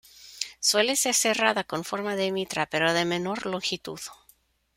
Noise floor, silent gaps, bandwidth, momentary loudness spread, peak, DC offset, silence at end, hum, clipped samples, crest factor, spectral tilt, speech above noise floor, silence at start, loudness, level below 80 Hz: -62 dBFS; none; 16 kHz; 13 LU; -6 dBFS; under 0.1%; 0.6 s; none; under 0.1%; 22 dB; -2 dB/octave; 36 dB; 0.2 s; -25 LUFS; -66 dBFS